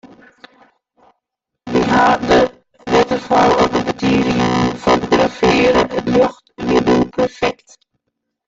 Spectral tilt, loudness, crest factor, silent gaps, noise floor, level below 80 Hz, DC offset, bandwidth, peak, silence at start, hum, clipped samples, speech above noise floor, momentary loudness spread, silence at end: -5.5 dB/octave; -15 LUFS; 14 dB; none; -78 dBFS; -40 dBFS; under 0.1%; 7.8 kHz; -2 dBFS; 0.05 s; none; under 0.1%; 65 dB; 7 LU; 0.95 s